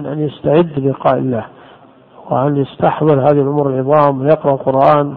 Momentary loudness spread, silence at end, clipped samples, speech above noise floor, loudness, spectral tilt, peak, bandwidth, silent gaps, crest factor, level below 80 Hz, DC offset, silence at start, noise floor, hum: 8 LU; 0 s; under 0.1%; 30 dB; -14 LUFS; -11 dB/octave; 0 dBFS; 4.7 kHz; none; 14 dB; -52 dBFS; under 0.1%; 0 s; -42 dBFS; none